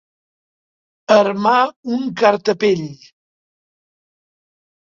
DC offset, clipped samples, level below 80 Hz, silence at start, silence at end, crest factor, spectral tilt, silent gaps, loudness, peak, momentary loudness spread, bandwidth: under 0.1%; under 0.1%; -66 dBFS; 1.1 s; 1.9 s; 20 dB; -5.5 dB/octave; 1.76-1.83 s; -16 LUFS; 0 dBFS; 9 LU; 7.6 kHz